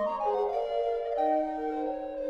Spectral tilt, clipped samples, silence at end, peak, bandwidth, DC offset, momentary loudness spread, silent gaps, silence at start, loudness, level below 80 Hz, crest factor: -6 dB/octave; under 0.1%; 0 s; -16 dBFS; 7.2 kHz; under 0.1%; 5 LU; none; 0 s; -30 LUFS; -60 dBFS; 14 dB